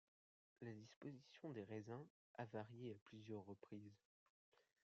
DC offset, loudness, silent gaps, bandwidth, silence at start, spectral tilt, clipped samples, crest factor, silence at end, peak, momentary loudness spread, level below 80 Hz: under 0.1%; -57 LUFS; 0.96-1.01 s, 2.10-2.34 s, 3.02-3.06 s; 7.4 kHz; 0.6 s; -6.5 dB/octave; under 0.1%; 20 dB; 0.9 s; -36 dBFS; 7 LU; under -90 dBFS